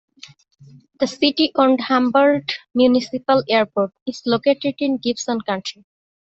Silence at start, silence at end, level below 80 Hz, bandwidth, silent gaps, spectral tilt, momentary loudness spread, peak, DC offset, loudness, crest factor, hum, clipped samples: 1 s; 0.55 s; -62 dBFS; 8 kHz; 4.02-4.06 s; -4.5 dB/octave; 9 LU; -2 dBFS; under 0.1%; -19 LUFS; 18 dB; none; under 0.1%